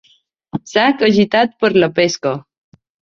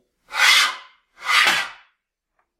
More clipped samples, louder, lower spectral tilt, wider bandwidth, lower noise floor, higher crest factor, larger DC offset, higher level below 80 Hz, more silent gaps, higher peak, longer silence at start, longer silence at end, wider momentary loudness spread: neither; about the same, -14 LUFS vs -16 LUFS; first, -5 dB/octave vs 2 dB/octave; second, 7.6 kHz vs 16.5 kHz; second, -44 dBFS vs -74 dBFS; about the same, 16 dB vs 20 dB; neither; first, -56 dBFS vs -70 dBFS; neither; about the same, 0 dBFS vs -2 dBFS; first, 0.55 s vs 0.3 s; second, 0.65 s vs 0.85 s; second, 15 LU vs 18 LU